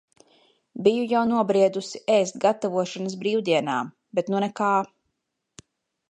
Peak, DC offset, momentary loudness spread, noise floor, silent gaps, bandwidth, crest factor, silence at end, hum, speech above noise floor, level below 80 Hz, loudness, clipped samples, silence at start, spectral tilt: -6 dBFS; under 0.1%; 8 LU; -79 dBFS; none; 10.5 kHz; 20 dB; 1.25 s; none; 56 dB; -72 dBFS; -24 LUFS; under 0.1%; 0.75 s; -5 dB/octave